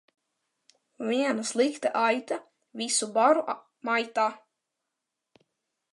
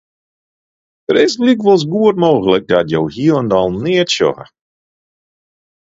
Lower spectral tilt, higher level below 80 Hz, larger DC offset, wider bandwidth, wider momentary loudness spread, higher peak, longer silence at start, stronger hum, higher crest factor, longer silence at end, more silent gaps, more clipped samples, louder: second, -2 dB/octave vs -5.5 dB/octave; second, -86 dBFS vs -50 dBFS; neither; first, 11.5 kHz vs 7.8 kHz; first, 13 LU vs 5 LU; second, -8 dBFS vs 0 dBFS; about the same, 1 s vs 1.1 s; neither; first, 20 dB vs 14 dB; about the same, 1.55 s vs 1.45 s; neither; neither; second, -27 LUFS vs -13 LUFS